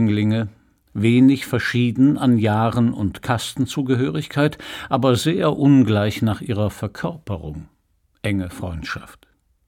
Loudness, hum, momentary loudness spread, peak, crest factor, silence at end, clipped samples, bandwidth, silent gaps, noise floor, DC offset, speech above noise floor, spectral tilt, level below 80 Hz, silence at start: -20 LUFS; none; 15 LU; -4 dBFS; 16 dB; 0.55 s; under 0.1%; 16.5 kHz; none; -64 dBFS; under 0.1%; 45 dB; -6.5 dB/octave; -46 dBFS; 0 s